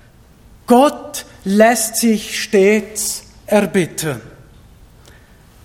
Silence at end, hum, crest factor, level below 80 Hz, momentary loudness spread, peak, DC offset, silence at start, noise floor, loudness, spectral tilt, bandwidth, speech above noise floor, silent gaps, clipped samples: 1.35 s; none; 16 dB; -48 dBFS; 15 LU; 0 dBFS; under 0.1%; 0.7 s; -45 dBFS; -15 LUFS; -4 dB/octave; 17 kHz; 31 dB; none; under 0.1%